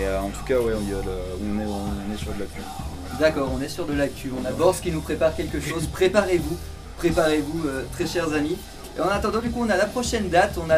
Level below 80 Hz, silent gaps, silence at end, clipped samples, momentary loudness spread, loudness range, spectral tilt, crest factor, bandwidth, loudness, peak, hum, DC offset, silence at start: -36 dBFS; none; 0 s; under 0.1%; 11 LU; 4 LU; -5 dB/octave; 20 dB; 16.5 kHz; -24 LUFS; -4 dBFS; none; under 0.1%; 0 s